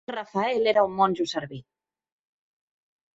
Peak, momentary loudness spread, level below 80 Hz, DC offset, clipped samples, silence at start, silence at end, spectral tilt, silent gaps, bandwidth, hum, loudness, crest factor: -8 dBFS; 15 LU; -68 dBFS; under 0.1%; under 0.1%; 0.1 s; 1.55 s; -5 dB/octave; none; 8 kHz; none; -24 LUFS; 20 dB